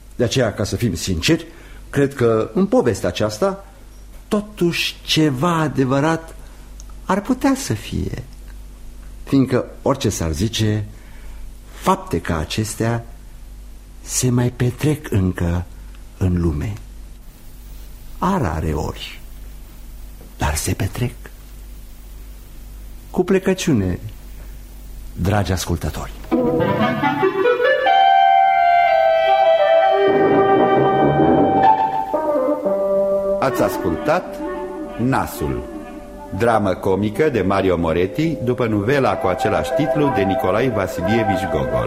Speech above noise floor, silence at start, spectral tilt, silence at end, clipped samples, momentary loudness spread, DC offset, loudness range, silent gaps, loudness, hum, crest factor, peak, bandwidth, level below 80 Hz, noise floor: 20 dB; 0 s; -5.5 dB/octave; 0 s; under 0.1%; 19 LU; under 0.1%; 10 LU; none; -18 LUFS; none; 16 dB; -4 dBFS; 16 kHz; -36 dBFS; -38 dBFS